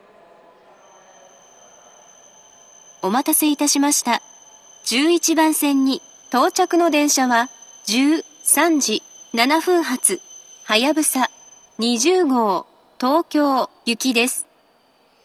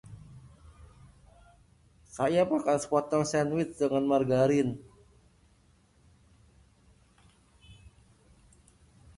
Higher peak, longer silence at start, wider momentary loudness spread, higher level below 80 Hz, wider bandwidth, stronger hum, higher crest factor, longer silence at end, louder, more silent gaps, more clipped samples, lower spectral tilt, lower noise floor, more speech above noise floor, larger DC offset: first, 0 dBFS vs -12 dBFS; first, 3 s vs 0.1 s; second, 10 LU vs 19 LU; second, -80 dBFS vs -60 dBFS; first, 14.5 kHz vs 11.5 kHz; neither; about the same, 20 dB vs 20 dB; second, 0.8 s vs 1.45 s; first, -18 LUFS vs -28 LUFS; neither; neither; second, -1.5 dB/octave vs -6 dB/octave; second, -57 dBFS vs -64 dBFS; about the same, 40 dB vs 37 dB; neither